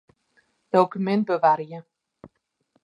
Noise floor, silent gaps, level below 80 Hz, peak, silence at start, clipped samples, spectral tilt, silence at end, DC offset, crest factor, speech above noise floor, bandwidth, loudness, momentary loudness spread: -70 dBFS; none; -74 dBFS; -4 dBFS; 0.75 s; under 0.1%; -8 dB/octave; 0.55 s; under 0.1%; 22 dB; 48 dB; 10 kHz; -22 LUFS; 14 LU